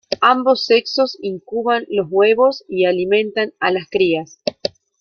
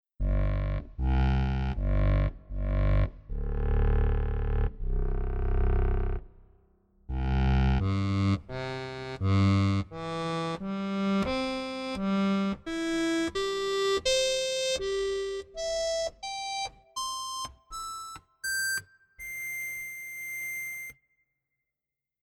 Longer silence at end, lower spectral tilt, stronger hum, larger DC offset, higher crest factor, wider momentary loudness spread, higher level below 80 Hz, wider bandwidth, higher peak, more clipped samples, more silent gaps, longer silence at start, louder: second, 0.3 s vs 1.35 s; about the same, -5 dB/octave vs -5 dB/octave; neither; neither; about the same, 16 dB vs 14 dB; about the same, 10 LU vs 11 LU; second, -62 dBFS vs -32 dBFS; second, 6.8 kHz vs 20 kHz; first, -2 dBFS vs -14 dBFS; neither; neither; about the same, 0.1 s vs 0.2 s; first, -17 LUFS vs -30 LUFS